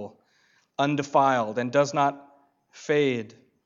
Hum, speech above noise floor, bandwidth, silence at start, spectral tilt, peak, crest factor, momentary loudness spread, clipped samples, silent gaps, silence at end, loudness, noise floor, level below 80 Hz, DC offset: none; 41 dB; 7.6 kHz; 0 s; -5.5 dB/octave; -8 dBFS; 20 dB; 18 LU; under 0.1%; none; 0.35 s; -24 LUFS; -65 dBFS; -82 dBFS; under 0.1%